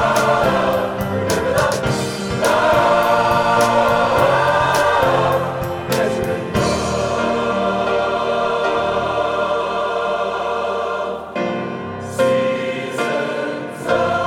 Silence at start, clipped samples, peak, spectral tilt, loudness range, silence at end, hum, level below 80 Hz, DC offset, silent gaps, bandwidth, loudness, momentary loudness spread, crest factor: 0 s; under 0.1%; -2 dBFS; -5 dB/octave; 6 LU; 0 s; none; -42 dBFS; under 0.1%; none; 18 kHz; -18 LUFS; 8 LU; 16 dB